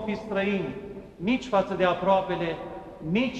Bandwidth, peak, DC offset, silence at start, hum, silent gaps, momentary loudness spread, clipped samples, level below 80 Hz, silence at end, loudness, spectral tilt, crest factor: 8.6 kHz; -10 dBFS; under 0.1%; 0 s; none; none; 14 LU; under 0.1%; -54 dBFS; 0 s; -27 LUFS; -6.5 dB/octave; 18 dB